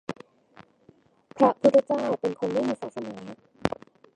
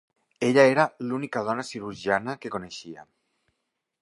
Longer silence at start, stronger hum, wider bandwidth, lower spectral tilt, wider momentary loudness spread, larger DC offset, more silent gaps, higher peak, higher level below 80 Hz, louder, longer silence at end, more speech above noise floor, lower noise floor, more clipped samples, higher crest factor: second, 0.1 s vs 0.4 s; neither; second, 9.8 kHz vs 11.5 kHz; about the same, -6.5 dB/octave vs -5.5 dB/octave; first, 20 LU vs 17 LU; neither; neither; about the same, -2 dBFS vs -4 dBFS; about the same, -62 dBFS vs -66 dBFS; about the same, -25 LUFS vs -25 LUFS; second, 0.5 s vs 1 s; second, 35 dB vs 55 dB; second, -59 dBFS vs -80 dBFS; neither; about the same, 24 dB vs 22 dB